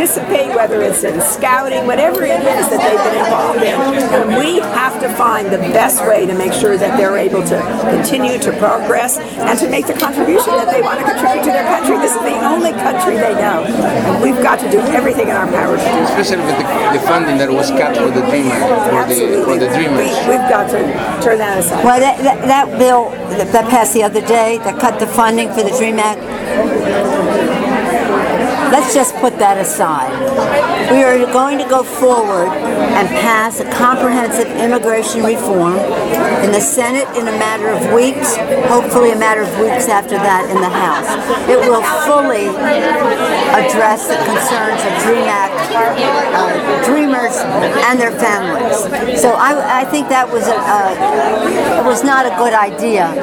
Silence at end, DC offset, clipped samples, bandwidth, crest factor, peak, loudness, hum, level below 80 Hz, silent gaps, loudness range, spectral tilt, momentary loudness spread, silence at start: 0 s; under 0.1%; under 0.1%; 19.5 kHz; 12 dB; 0 dBFS; -12 LUFS; none; -46 dBFS; none; 1 LU; -3.5 dB/octave; 4 LU; 0 s